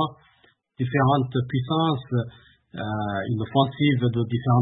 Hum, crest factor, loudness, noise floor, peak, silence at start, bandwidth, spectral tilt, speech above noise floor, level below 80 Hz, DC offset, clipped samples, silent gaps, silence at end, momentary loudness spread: none; 18 dB; -24 LUFS; -61 dBFS; -6 dBFS; 0 s; 4 kHz; -12 dB/octave; 39 dB; -56 dBFS; under 0.1%; under 0.1%; none; 0 s; 10 LU